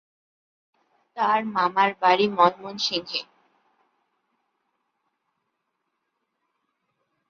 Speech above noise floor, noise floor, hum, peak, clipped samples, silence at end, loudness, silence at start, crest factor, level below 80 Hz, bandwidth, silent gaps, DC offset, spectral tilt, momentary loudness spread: 56 dB; -78 dBFS; none; -4 dBFS; under 0.1%; 4.05 s; -22 LUFS; 1.15 s; 24 dB; -74 dBFS; 7.2 kHz; none; under 0.1%; -4 dB/octave; 10 LU